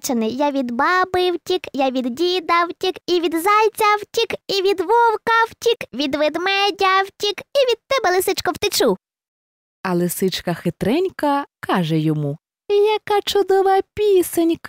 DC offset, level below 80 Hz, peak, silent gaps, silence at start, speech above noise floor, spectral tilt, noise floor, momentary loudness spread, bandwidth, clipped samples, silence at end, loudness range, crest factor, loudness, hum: under 0.1%; -54 dBFS; -6 dBFS; 9.28-9.84 s; 0.05 s; over 72 dB; -4.5 dB/octave; under -90 dBFS; 7 LU; 16.5 kHz; under 0.1%; 0 s; 4 LU; 12 dB; -19 LUFS; none